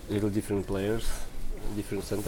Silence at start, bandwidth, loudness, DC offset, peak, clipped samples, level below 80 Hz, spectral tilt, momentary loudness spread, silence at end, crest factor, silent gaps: 0 s; 18 kHz; -32 LUFS; under 0.1%; -16 dBFS; under 0.1%; -36 dBFS; -6 dB/octave; 11 LU; 0 s; 14 dB; none